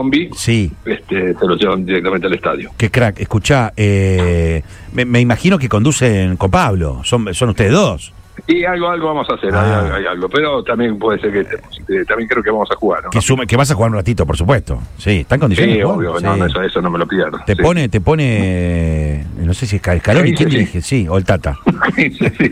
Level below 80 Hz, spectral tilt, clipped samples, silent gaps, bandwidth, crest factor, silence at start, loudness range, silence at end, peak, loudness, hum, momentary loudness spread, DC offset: -30 dBFS; -6 dB/octave; under 0.1%; none; 14.5 kHz; 14 dB; 0 s; 2 LU; 0 s; 0 dBFS; -14 LUFS; none; 6 LU; under 0.1%